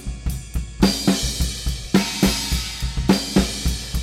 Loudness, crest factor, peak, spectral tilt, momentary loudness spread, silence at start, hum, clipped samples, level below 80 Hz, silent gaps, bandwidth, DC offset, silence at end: -21 LUFS; 20 dB; -2 dBFS; -4.5 dB/octave; 10 LU; 0 s; none; under 0.1%; -28 dBFS; none; 16.5 kHz; under 0.1%; 0 s